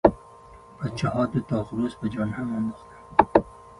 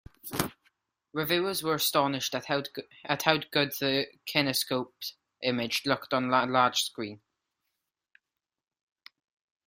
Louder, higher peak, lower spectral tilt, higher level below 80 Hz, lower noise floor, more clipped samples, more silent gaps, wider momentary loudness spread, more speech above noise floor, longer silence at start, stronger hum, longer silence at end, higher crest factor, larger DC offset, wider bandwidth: about the same, -26 LUFS vs -28 LUFS; first, 0 dBFS vs -4 dBFS; first, -8 dB/octave vs -3.5 dB/octave; first, -48 dBFS vs -66 dBFS; second, -48 dBFS vs -88 dBFS; neither; neither; about the same, 12 LU vs 13 LU; second, 21 dB vs 59 dB; second, 0.05 s vs 0.25 s; neither; second, 0.1 s vs 2.5 s; about the same, 26 dB vs 28 dB; neither; second, 11.5 kHz vs 16 kHz